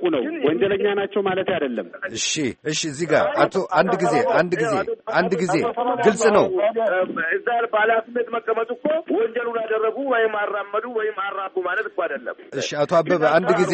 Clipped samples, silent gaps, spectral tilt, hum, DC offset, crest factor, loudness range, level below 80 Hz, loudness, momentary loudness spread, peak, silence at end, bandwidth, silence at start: under 0.1%; none; -4.5 dB/octave; none; under 0.1%; 18 dB; 4 LU; -62 dBFS; -21 LUFS; 8 LU; -4 dBFS; 0 s; 8.8 kHz; 0 s